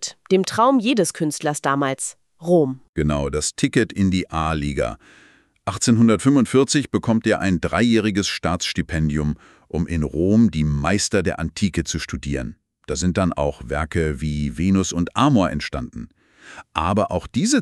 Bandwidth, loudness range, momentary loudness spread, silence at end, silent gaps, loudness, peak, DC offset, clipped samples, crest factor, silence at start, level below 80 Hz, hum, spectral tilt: 13 kHz; 4 LU; 11 LU; 0 s; 2.89-2.93 s; -20 LUFS; -4 dBFS; under 0.1%; under 0.1%; 18 dB; 0 s; -38 dBFS; none; -5 dB/octave